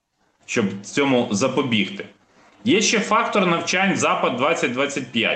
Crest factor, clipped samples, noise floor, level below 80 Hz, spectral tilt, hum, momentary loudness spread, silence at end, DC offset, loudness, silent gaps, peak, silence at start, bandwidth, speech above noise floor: 14 dB; under 0.1%; -52 dBFS; -66 dBFS; -3.5 dB/octave; none; 6 LU; 0 s; under 0.1%; -20 LUFS; none; -6 dBFS; 0.5 s; 9.2 kHz; 32 dB